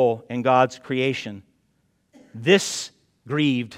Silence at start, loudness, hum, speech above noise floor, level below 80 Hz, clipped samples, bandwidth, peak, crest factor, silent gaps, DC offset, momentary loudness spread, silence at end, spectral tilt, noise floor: 0 s; -22 LUFS; none; 46 dB; -70 dBFS; under 0.1%; 15.5 kHz; -2 dBFS; 20 dB; none; under 0.1%; 15 LU; 0 s; -4.5 dB/octave; -67 dBFS